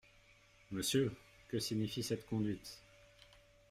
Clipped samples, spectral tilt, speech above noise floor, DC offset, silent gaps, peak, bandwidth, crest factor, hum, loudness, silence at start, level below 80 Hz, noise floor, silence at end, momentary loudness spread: under 0.1%; -4.5 dB/octave; 28 dB; under 0.1%; none; -22 dBFS; 16 kHz; 18 dB; none; -39 LUFS; 0.7 s; -66 dBFS; -66 dBFS; 0.9 s; 16 LU